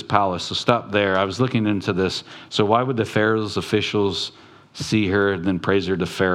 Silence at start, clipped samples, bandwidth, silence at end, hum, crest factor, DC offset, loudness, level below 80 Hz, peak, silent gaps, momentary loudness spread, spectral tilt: 0 s; under 0.1%; 13.5 kHz; 0 s; none; 20 dB; under 0.1%; -21 LUFS; -56 dBFS; 0 dBFS; none; 6 LU; -5.5 dB/octave